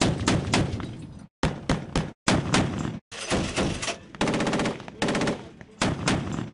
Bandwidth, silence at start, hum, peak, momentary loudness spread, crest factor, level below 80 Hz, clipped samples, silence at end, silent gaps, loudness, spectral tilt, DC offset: 11 kHz; 0 s; none; -10 dBFS; 11 LU; 18 dB; -42 dBFS; under 0.1%; 0 s; 1.30-1.43 s, 2.15-2.26 s, 3.01-3.11 s; -27 LUFS; -4.5 dB/octave; under 0.1%